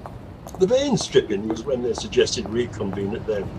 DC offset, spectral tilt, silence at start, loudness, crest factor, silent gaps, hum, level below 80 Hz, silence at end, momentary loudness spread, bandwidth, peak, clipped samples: under 0.1%; -5 dB/octave; 0 s; -23 LUFS; 20 dB; none; none; -44 dBFS; 0 s; 8 LU; 12 kHz; -4 dBFS; under 0.1%